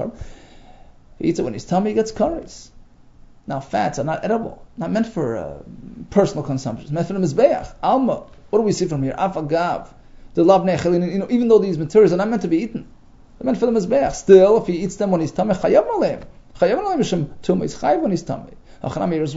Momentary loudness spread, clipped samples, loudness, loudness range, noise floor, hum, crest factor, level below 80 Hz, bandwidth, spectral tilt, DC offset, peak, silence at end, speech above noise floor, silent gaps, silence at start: 14 LU; under 0.1%; -19 LUFS; 8 LU; -45 dBFS; none; 20 dB; -44 dBFS; 8 kHz; -7 dB/octave; under 0.1%; 0 dBFS; 0 s; 27 dB; none; 0 s